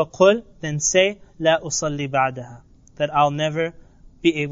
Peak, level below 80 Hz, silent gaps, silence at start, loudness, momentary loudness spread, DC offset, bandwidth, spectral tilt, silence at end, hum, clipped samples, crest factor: -4 dBFS; -50 dBFS; none; 0 s; -21 LUFS; 11 LU; under 0.1%; 7.6 kHz; -3.5 dB/octave; 0 s; none; under 0.1%; 18 dB